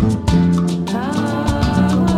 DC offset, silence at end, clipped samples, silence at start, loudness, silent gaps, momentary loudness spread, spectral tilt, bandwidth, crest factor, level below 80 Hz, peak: under 0.1%; 0 s; under 0.1%; 0 s; -17 LUFS; none; 5 LU; -7 dB/octave; 12.5 kHz; 12 dB; -28 dBFS; -2 dBFS